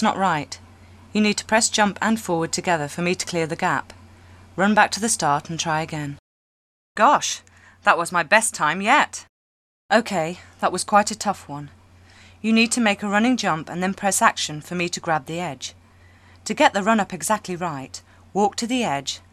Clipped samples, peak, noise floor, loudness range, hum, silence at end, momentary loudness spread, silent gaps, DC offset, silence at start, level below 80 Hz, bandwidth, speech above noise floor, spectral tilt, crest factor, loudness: under 0.1%; 0 dBFS; -51 dBFS; 3 LU; none; 0.15 s; 13 LU; 6.19-6.95 s, 9.29-9.89 s; under 0.1%; 0 s; -62 dBFS; 15.5 kHz; 30 dB; -3.5 dB/octave; 22 dB; -21 LUFS